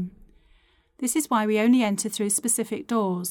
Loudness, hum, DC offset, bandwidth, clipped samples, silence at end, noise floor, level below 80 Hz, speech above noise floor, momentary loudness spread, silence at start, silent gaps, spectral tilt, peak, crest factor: -24 LUFS; none; under 0.1%; over 20 kHz; under 0.1%; 0 s; -61 dBFS; -62 dBFS; 37 dB; 7 LU; 0 s; none; -4 dB/octave; -10 dBFS; 14 dB